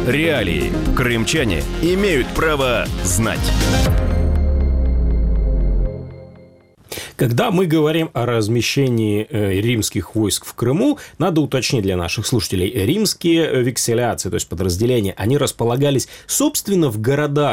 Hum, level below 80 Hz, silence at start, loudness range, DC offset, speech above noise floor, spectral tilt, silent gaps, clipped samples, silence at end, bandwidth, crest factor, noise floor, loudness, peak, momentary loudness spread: none; -24 dBFS; 0 s; 2 LU; under 0.1%; 29 dB; -5 dB/octave; none; under 0.1%; 0 s; 16.5 kHz; 14 dB; -47 dBFS; -18 LUFS; -4 dBFS; 4 LU